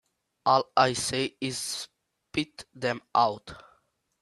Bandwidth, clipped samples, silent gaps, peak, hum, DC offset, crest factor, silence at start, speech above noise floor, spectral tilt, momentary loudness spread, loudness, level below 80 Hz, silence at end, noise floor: 13 kHz; under 0.1%; none; -6 dBFS; none; under 0.1%; 22 dB; 0.45 s; 41 dB; -3.5 dB/octave; 14 LU; -28 LUFS; -64 dBFS; 0.6 s; -68 dBFS